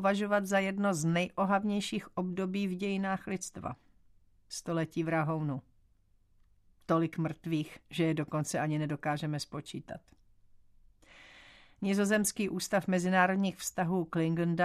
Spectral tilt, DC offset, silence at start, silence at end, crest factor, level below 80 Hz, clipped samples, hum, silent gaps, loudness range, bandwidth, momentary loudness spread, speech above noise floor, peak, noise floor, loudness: -5.5 dB/octave; under 0.1%; 0 s; 0 s; 20 dB; -66 dBFS; under 0.1%; none; none; 6 LU; 14 kHz; 12 LU; 35 dB; -12 dBFS; -67 dBFS; -32 LUFS